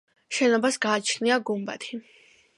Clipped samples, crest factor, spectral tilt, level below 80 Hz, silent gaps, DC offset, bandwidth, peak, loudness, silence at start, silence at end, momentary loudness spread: under 0.1%; 18 dB; -3 dB/octave; -80 dBFS; none; under 0.1%; 11.5 kHz; -8 dBFS; -25 LUFS; 0.3 s; 0.55 s; 14 LU